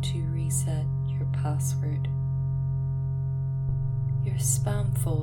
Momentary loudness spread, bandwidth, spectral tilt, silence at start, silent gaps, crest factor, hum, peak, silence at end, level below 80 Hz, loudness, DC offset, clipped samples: 4 LU; 18 kHz; -6 dB/octave; 0 s; none; 14 dB; none; -12 dBFS; 0 s; -42 dBFS; -28 LUFS; under 0.1%; under 0.1%